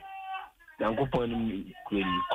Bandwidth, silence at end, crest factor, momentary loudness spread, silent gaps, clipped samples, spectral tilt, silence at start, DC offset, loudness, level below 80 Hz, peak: 15.5 kHz; 0 s; 16 dB; 11 LU; none; under 0.1%; -7.5 dB/octave; 0 s; under 0.1%; -32 LUFS; -52 dBFS; -16 dBFS